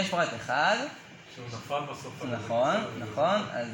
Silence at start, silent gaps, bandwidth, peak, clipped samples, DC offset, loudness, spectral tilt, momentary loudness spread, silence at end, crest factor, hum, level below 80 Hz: 0 s; none; 17 kHz; -12 dBFS; under 0.1%; under 0.1%; -29 LUFS; -4.5 dB/octave; 15 LU; 0 s; 18 dB; none; -68 dBFS